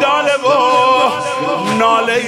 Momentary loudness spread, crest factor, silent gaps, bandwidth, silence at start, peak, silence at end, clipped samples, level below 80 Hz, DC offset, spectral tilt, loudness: 6 LU; 10 dB; none; 16 kHz; 0 s; -2 dBFS; 0 s; under 0.1%; -60 dBFS; under 0.1%; -3.5 dB/octave; -13 LUFS